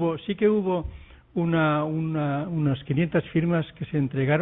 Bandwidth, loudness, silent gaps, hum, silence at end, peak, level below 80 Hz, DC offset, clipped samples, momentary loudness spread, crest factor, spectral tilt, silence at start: 4 kHz; -25 LUFS; none; none; 0 s; -10 dBFS; -50 dBFS; under 0.1%; under 0.1%; 6 LU; 14 dB; -12 dB/octave; 0 s